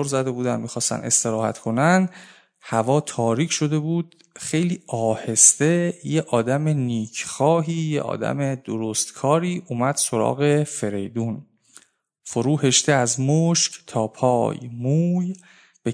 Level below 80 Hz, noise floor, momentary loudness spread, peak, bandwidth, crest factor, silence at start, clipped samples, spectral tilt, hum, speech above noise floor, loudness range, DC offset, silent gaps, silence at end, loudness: -66 dBFS; -53 dBFS; 10 LU; 0 dBFS; 11 kHz; 22 dB; 0 s; under 0.1%; -4.5 dB/octave; none; 32 dB; 4 LU; under 0.1%; none; 0 s; -21 LUFS